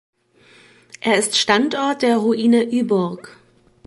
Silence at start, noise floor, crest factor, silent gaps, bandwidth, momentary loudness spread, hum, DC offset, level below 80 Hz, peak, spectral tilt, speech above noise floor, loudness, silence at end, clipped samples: 1.05 s; -52 dBFS; 18 dB; none; 11.5 kHz; 8 LU; none; under 0.1%; -64 dBFS; -2 dBFS; -3.5 dB/octave; 34 dB; -18 LUFS; 0.6 s; under 0.1%